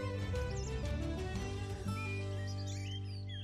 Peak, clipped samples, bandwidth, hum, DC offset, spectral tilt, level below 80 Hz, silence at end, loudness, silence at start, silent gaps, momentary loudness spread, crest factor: -26 dBFS; under 0.1%; 13 kHz; 50 Hz at -60 dBFS; under 0.1%; -6 dB/octave; -46 dBFS; 0 s; -40 LUFS; 0 s; none; 3 LU; 12 dB